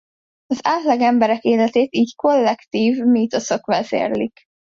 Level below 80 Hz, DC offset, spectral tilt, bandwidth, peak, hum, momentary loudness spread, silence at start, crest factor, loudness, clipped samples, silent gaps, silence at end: -62 dBFS; under 0.1%; -5 dB/octave; 7.6 kHz; -4 dBFS; none; 6 LU; 0.5 s; 14 dB; -18 LUFS; under 0.1%; none; 0.45 s